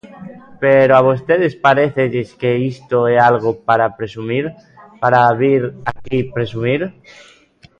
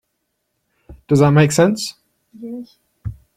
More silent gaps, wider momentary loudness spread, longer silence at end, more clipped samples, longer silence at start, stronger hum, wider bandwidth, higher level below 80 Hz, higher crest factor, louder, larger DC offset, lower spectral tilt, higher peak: neither; second, 10 LU vs 21 LU; first, 0.9 s vs 0.25 s; neither; second, 0.05 s vs 0.9 s; neither; second, 7.6 kHz vs 15 kHz; second, -52 dBFS vs -46 dBFS; about the same, 16 dB vs 18 dB; about the same, -15 LUFS vs -15 LUFS; neither; first, -8 dB/octave vs -6 dB/octave; about the same, 0 dBFS vs -2 dBFS